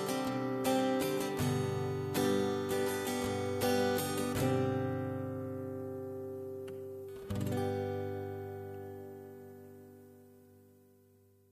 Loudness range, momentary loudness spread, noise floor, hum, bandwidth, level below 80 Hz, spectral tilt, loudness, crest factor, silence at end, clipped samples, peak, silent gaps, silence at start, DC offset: 10 LU; 15 LU; -65 dBFS; none; 14 kHz; -64 dBFS; -5.5 dB/octave; -35 LUFS; 16 dB; 0.95 s; under 0.1%; -18 dBFS; none; 0 s; under 0.1%